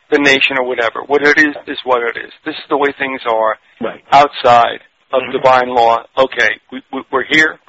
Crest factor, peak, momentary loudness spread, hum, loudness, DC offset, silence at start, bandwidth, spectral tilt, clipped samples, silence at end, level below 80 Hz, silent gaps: 14 dB; 0 dBFS; 15 LU; none; -13 LUFS; under 0.1%; 0.1 s; 8 kHz; -0.5 dB/octave; under 0.1%; 0.15 s; -52 dBFS; none